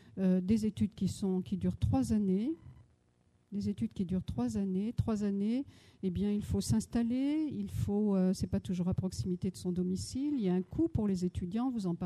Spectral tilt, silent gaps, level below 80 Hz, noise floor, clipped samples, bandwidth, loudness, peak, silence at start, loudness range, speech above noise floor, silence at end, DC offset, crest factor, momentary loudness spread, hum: -7.5 dB/octave; none; -52 dBFS; -70 dBFS; under 0.1%; 13 kHz; -34 LUFS; -18 dBFS; 0.05 s; 3 LU; 38 dB; 0 s; under 0.1%; 16 dB; 6 LU; none